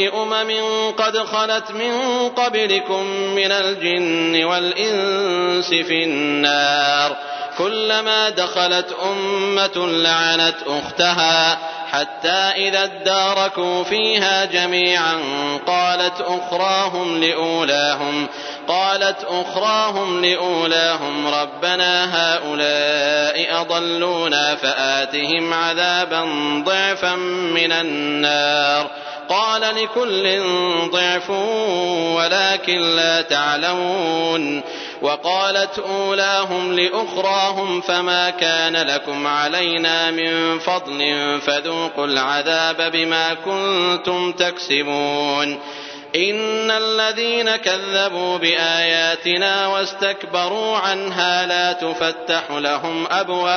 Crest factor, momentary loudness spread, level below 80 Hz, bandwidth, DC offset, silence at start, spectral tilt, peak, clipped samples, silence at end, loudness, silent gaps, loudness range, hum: 18 dB; 6 LU; -72 dBFS; 6.6 kHz; under 0.1%; 0 s; -2.5 dB/octave; 0 dBFS; under 0.1%; 0 s; -18 LUFS; none; 2 LU; none